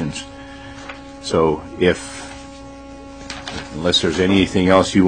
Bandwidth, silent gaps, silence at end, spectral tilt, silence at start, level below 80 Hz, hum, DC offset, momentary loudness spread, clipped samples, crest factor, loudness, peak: 9.6 kHz; none; 0 s; -5 dB/octave; 0 s; -42 dBFS; none; 0.2%; 22 LU; under 0.1%; 20 dB; -18 LUFS; 0 dBFS